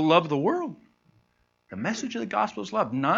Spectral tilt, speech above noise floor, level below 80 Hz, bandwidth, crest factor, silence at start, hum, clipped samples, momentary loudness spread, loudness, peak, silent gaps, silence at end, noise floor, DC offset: -5.5 dB/octave; 44 dB; -70 dBFS; 7.8 kHz; 22 dB; 0 s; 60 Hz at -60 dBFS; under 0.1%; 11 LU; -27 LUFS; -4 dBFS; none; 0 s; -69 dBFS; under 0.1%